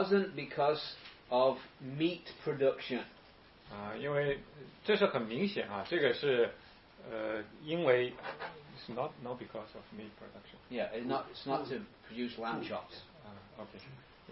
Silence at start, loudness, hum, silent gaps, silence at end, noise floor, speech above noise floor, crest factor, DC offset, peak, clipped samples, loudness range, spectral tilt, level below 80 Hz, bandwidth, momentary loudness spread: 0 s; -36 LUFS; none; none; 0 s; -59 dBFS; 23 dB; 22 dB; under 0.1%; -14 dBFS; under 0.1%; 7 LU; -3.5 dB/octave; -68 dBFS; 5.8 kHz; 20 LU